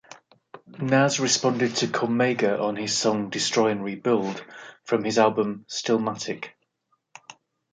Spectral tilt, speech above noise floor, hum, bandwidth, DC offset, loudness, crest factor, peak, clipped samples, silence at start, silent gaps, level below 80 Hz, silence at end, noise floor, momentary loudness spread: -4 dB/octave; 49 dB; none; 9.6 kHz; under 0.1%; -24 LUFS; 20 dB; -6 dBFS; under 0.1%; 0.55 s; none; -70 dBFS; 0.4 s; -73 dBFS; 12 LU